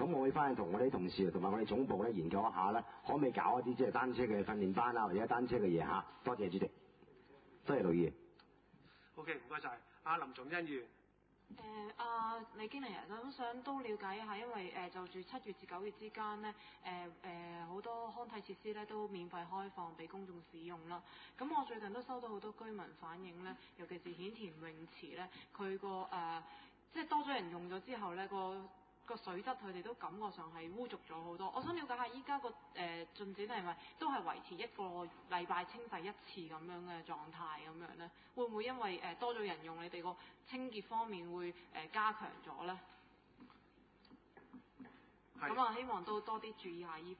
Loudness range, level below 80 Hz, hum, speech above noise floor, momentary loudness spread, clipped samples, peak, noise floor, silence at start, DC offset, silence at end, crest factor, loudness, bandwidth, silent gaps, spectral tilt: 11 LU; -72 dBFS; none; 29 dB; 15 LU; under 0.1%; -22 dBFS; -72 dBFS; 0 s; under 0.1%; 0 s; 20 dB; -43 LUFS; 4.8 kHz; none; -4 dB/octave